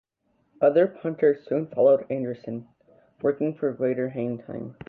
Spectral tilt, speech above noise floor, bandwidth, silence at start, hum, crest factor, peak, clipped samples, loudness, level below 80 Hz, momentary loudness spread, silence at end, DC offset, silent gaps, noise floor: -10.5 dB/octave; 46 dB; 4.4 kHz; 0.6 s; none; 18 dB; -8 dBFS; under 0.1%; -25 LUFS; -68 dBFS; 14 LU; 0.15 s; under 0.1%; none; -70 dBFS